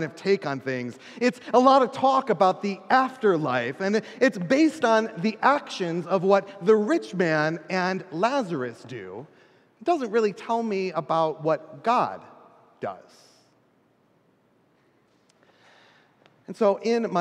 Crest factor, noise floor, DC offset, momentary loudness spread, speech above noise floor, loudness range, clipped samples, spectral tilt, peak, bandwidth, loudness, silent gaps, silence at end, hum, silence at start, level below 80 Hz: 20 dB; -64 dBFS; under 0.1%; 14 LU; 40 dB; 10 LU; under 0.1%; -6 dB/octave; -4 dBFS; 11.5 kHz; -24 LUFS; none; 0 s; none; 0 s; -80 dBFS